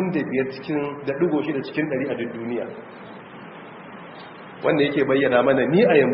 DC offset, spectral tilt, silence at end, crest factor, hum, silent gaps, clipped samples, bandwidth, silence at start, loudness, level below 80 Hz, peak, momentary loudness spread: under 0.1%; -11 dB/octave; 0 s; 18 dB; none; none; under 0.1%; 5.8 kHz; 0 s; -22 LUFS; -62 dBFS; -4 dBFS; 22 LU